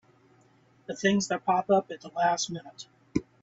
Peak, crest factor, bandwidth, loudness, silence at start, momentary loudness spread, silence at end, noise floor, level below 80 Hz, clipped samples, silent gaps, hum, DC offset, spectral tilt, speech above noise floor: -12 dBFS; 18 dB; 8 kHz; -28 LUFS; 0.9 s; 19 LU; 0.2 s; -62 dBFS; -64 dBFS; under 0.1%; none; none; under 0.1%; -4 dB/octave; 34 dB